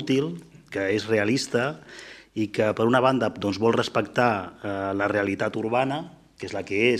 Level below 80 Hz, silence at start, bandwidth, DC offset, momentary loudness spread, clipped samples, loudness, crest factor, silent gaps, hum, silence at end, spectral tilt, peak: -62 dBFS; 0 s; 13.5 kHz; under 0.1%; 14 LU; under 0.1%; -25 LUFS; 20 dB; none; none; 0 s; -5.5 dB/octave; -6 dBFS